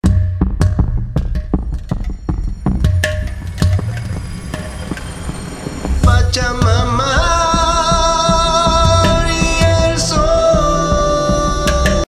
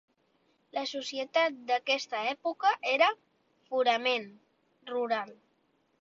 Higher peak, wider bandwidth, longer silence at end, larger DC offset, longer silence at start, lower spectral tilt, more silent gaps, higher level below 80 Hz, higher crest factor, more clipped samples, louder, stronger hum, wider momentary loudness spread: first, 0 dBFS vs -12 dBFS; first, 15 kHz vs 7.8 kHz; second, 0.05 s vs 0.65 s; neither; second, 0.05 s vs 0.75 s; first, -5 dB/octave vs -2 dB/octave; neither; first, -20 dBFS vs -80 dBFS; second, 14 dB vs 20 dB; neither; first, -15 LUFS vs -30 LUFS; neither; about the same, 13 LU vs 11 LU